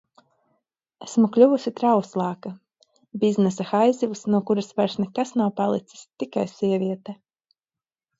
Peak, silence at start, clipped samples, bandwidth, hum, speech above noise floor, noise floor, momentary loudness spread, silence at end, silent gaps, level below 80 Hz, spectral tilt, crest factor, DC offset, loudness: -4 dBFS; 1 s; under 0.1%; 8 kHz; none; over 68 dB; under -90 dBFS; 16 LU; 1.05 s; none; -72 dBFS; -7 dB/octave; 20 dB; under 0.1%; -23 LUFS